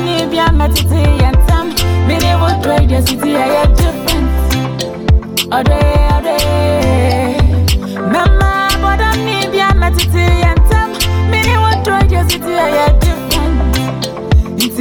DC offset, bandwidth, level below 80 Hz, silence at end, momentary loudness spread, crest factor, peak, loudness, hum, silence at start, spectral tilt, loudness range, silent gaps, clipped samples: under 0.1%; 19.5 kHz; -14 dBFS; 0 s; 4 LU; 10 dB; 0 dBFS; -12 LUFS; none; 0 s; -5.5 dB/octave; 1 LU; none; under 0.1%